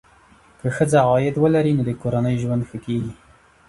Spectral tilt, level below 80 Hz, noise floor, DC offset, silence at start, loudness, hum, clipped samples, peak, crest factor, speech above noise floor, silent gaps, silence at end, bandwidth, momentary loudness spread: -7.5 dB/octave; -50 dBFS; -52 dBFS; under 0.1%; 0.65 s; -20 LUFS; none; under 0.1%; -4 dBFS; 18 dB; 33 dB; none; 0.55 s; 11.5 kHz; 10 LU